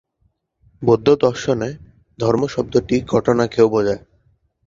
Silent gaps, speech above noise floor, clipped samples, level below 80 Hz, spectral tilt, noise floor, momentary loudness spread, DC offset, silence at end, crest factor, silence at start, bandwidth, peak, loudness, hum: none; 49 dB; under 0.1%; -48 dBFS; -6.5 dB/octave; -65 dBFS; 8 LU; under 0.1%; 0.7 s; 18 dB; 0.8 s; 7.6 kHz; 0 dBFS; -18 LUFS; none